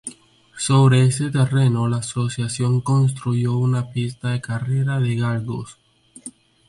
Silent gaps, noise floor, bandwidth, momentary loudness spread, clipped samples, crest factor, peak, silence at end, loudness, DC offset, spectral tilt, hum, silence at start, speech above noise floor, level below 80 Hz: none; -46 dBFS; 11.5 kHz; 16 LU; under 0.1%; 16 dB; -4 dBFS; 0.4 s; -20 LUFS; under 0.1%; -6 dB/octave; none; 0.05 s; 27 dB; -54 dBFS